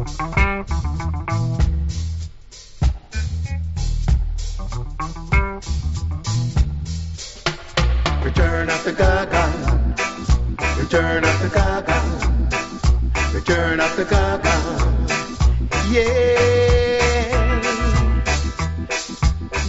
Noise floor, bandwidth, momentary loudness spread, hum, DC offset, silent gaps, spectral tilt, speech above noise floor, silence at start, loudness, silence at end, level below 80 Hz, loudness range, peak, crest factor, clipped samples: -39 dBFS; 8 kHz; 9 LU; none; under 0.1%; none; -5 dB/octave; 22 dB; 0 s; -20 LUFS; 0 s; -22 dBFS; 6 LU; -4 dBFS; 16 dB; under 0.1%